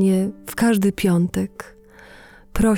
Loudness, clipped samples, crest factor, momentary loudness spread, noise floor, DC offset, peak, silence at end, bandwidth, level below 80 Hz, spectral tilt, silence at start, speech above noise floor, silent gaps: -20 LUFS; under 0.1%; 14 dB; 16 LU; -45 dBFS; under 0.1%; -6 dBFS; 0 s; 18.5 kHz; -38 dBFS; -6.5 dB/octave; 0 s; 26 dB; none